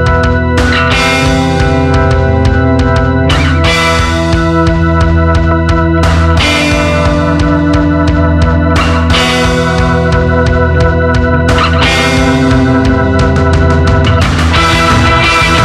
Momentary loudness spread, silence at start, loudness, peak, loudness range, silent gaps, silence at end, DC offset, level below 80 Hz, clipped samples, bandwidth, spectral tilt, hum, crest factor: 2 LU; 0 s; -9 LUFS; 0 dBFS; 1 LU; none; 0 s; under 0.1%; -16 dBFS; under 0.1%; 12.5 kHz; -6 dB/octave; none; 8 dB